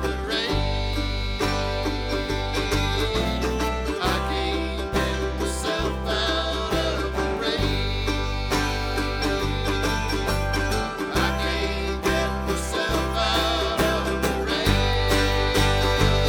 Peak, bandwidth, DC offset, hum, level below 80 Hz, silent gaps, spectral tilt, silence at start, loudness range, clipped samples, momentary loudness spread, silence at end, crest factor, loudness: -4 dBFS; over 20 kHz; under 0.1%; none; -30 dBFS; none; -4.5 dB/octave; 0 s; 3 LU; under 0.1%; 5 LU; 0 s; 20 dB; -24 LUFS